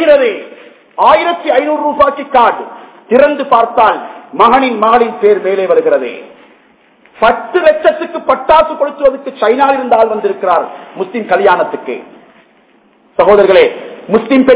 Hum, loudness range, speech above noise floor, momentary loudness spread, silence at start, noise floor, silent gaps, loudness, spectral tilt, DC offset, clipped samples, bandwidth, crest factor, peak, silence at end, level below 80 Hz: none; 3 LU; 38 dB; 13 LU; 0 s; -48 dBFS; none; -10 LUFS; -8.5 dB/octave; under 0.1%; 2%; 4 kHz; 10 dB; 0 dBFS; 0 s; -46 dBFS